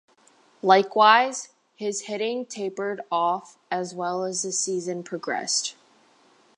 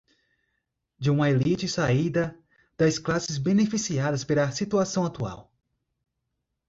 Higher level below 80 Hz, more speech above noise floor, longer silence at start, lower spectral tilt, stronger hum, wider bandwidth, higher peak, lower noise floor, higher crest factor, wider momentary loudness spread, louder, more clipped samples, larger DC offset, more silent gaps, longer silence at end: second, -86 dBFS vs -56 dBFS; second, 35 dB vs 56 dB; second, 0.65 s vs 1 s; second, -2 dB/octave vs -5.5 dB/octave; neither; first, 11.5 kHz vs 8 kHz; first, -2 dBFS vs -10 dBFS; second, -59 dBFS vs -80 dBFS; first, 22 dB vs 16 dB; first, 15 LU vs 7 LU; about the same, -24 LUFS vs -25 LUFS; neither; neither; neither; second, 0.85 s vs 1.25 s